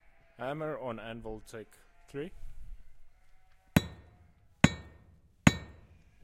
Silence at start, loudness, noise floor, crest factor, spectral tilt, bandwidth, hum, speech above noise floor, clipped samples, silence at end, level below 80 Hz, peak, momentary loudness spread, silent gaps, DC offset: 0.4 s; -33 LUFS; -61 dBFS; 30 dB; -5.5 dB/octave; 16 kHz; none; 22 dB; under 0.1%; 0.5 s; -52 dBFS; -4 dBFS; 25 LU; none; under 0.1%